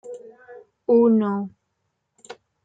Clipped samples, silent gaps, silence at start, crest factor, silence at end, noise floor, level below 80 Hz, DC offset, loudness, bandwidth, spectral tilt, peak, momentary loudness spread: under 0.1%; none; 0.05 s; 18 dB; 0.3 s; -75 dBFS; -68 dBFS; under 0.1%; -20 LUFS; 7.8 kHz; -8.5 dB/octave; -6 dBFS; 23 LU